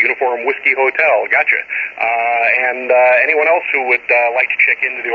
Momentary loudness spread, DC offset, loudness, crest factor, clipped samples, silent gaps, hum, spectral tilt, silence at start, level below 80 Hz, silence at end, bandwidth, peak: 5 LU; under 0.1%; -13 LUFS; 14 dB; under 0.1%; none; none; -4 dB/octave; 0 s; -66 dBFS; 0 s; 6.6 kHz; 0 dBFS